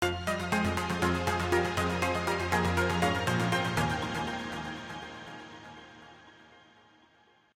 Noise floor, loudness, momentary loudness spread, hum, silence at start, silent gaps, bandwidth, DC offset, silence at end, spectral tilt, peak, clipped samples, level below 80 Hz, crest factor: -64 dBFS; -30 LUFS; 18 LU; none; 0 s; none; 17 kHz; under 0.1%; 1.15 s; -5 dB/octave; -14 dBFS; under 0.1%; -50 dBFS; 18 dB